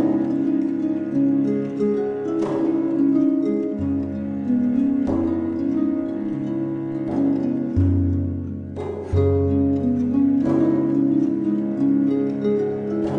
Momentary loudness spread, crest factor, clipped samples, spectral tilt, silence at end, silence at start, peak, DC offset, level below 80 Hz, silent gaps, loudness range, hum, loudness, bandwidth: 6 LU; 12 dB; under 0.1%; -10.5 dB/octave; 0 s; 0 s; -8 dBFS; under 0.1%; -46 dBFS; none; 3 LU; none; -21 LUFS; 5.8 kHz